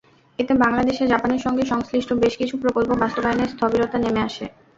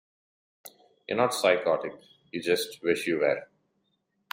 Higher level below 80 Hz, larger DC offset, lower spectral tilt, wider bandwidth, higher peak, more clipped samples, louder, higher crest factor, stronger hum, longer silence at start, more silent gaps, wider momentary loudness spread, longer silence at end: first, -46 dBFS vs -74 dBFS; neither; first, -6 dB/octave vs -3.5 dB/octave; second, 7.8 kHz vs 16 kHz; first, -4 dBFS vs -8 dBFS; neither; first, -21 LUFS vs -27 LUFS; about the same, 18 dB vs 22 dB; neither; second, 0.4 s vs 0.65 s; neither; second, 5 LU vs 13 LU; second, 0.3 s vs 0.9 s